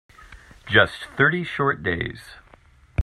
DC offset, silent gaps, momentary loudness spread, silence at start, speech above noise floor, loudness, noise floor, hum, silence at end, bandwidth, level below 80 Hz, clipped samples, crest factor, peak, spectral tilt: under 0.1%; none; 13 LU; 0.2 s; 30 dB; -22 LUFS; -53 dBFS; none; 0 s; 13 kHz; -40 dBFS; under 0.1%; 22 dB; -2 dBFS; -6 dB/octave